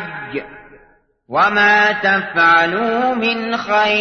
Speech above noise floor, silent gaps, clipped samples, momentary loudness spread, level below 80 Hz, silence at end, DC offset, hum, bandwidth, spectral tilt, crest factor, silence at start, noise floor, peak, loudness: 38 dB; none; under 0.1%; 14 LU; -54 dBFS; 0 s; under 0.1%; none; 6.6 kHz; -4.5 dB/octave; 14 dB; 0 s; -53 dBFS; -2 dBFS; -14 LUFS